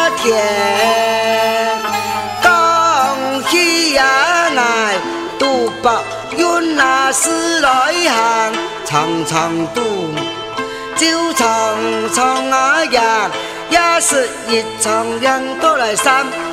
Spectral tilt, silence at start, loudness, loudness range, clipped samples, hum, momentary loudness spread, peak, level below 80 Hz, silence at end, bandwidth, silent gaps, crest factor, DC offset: -2 dB/octave; 0 s; -14 LUFS; 4 LU; under 0.1%; none; 7 LU; 0 dBFS; -50 dBFS; 0 s; 16 kHz; none; 14 dB; under 0.1%